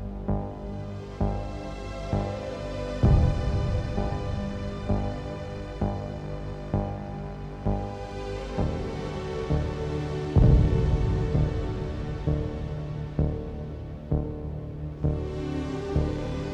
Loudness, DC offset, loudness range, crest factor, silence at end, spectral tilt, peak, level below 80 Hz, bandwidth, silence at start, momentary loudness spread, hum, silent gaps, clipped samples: -29 LUFS; under 0.1%; 7 LU; 20 dB; 0 s; -8.5 dB/octave; -8 dBFS; -32 dBFS; 8.8 kHz; 0 s; 13 LU; none; none; under 0.1%